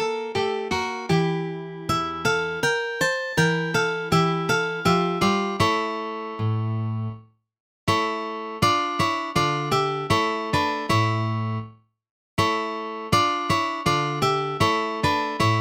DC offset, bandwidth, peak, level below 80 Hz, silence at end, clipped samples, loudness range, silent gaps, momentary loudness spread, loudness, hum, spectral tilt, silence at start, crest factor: under 0.1%; 17 kHz; -4 dBFS; -52 dBFS; 0 s; under 0.1%; 3 LU; 7.60-7.87 s, 12.10-12.37 s; 8 LU; -23 LUFS; none; -5 dB/octave; 0 s; 20 dB